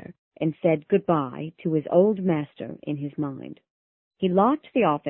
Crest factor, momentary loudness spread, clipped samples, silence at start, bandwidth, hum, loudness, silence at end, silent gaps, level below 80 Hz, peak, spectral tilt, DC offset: 20 dB; 12 LU; under 0.1%; 0.1 s; 3.9 kHz; none; -24 LUFS; 0 s; 0.19-0.31 s, 3.70-4.11 s; -64 dBFS; -6 dBFS; -12 dB/octave; under 0.1%